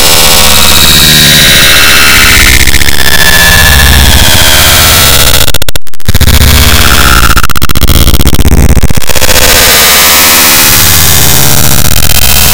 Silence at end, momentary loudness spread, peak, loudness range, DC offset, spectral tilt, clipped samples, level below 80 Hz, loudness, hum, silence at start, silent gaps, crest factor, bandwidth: 0 s; 7 LU; 0 dBFS; 4 LU; under 0.1%; -2 dB/octave; 40%; -10 dBFS; -2 LUFS; none; 0 s; none; 2 dB; over 20 kHz